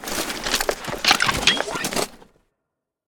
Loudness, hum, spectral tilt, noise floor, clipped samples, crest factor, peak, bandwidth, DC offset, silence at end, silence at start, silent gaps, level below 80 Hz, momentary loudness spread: -21 LUFS; none; -1.5 dB/octave; -81 dBFS; under 0.1%; 22 dB; -2 dBFS; over 20 kHz; under 0.1%; 0.85 s; 0 s; none; -44 dBFS; 9 LU